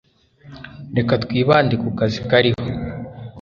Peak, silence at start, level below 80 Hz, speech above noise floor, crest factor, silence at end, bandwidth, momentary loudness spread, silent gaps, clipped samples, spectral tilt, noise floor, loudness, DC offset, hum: -2 dBFS; 0.45 s; -44 dBFS; 29 dB; 18 dB; 0 s; 7.2 kHz; 20 LU; none; under 0.1%; -7.5 dB/octave; -46 dBFS; -19 LUFS; under 0.1%; none